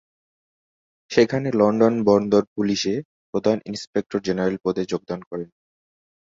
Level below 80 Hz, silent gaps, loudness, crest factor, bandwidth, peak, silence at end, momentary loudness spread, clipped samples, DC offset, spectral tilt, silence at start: -58 dBFS; 2.47-2.56 s, 3.05-3.33 s, 3.87-3.93 s, 5.27-5.31 s; -22 LUFS; 20 dB; 7.8 kHz; -2 dBFS; 0.85 s; 13 LU; under 0.1%; under 0.1%; -6 dB/octave; 1.1 s